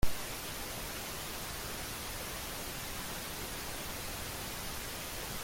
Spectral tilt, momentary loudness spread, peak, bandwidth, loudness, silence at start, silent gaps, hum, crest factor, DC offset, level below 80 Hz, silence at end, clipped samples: -2.5 dB/octave; 0 LU; -16 dBFS; 17 kHz; -40 LUFS; 0 s; none; none; 22 dB; under 0.1%; -48 dBFS; 0 s; under 0.1%